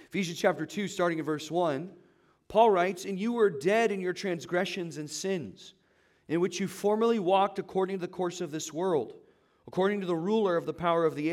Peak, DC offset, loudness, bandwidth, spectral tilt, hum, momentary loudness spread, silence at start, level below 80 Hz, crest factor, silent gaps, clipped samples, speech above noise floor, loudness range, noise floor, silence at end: -10 dBFS; under 0.1%; -29 LUFS; 15.5 kHz; -5 dB/octave; none; 10 LU; 0.15 s; -70 dBFS; 20 dB; none; under 0.1%; 38 dB; 3 LU; -67 dBFS; 0 s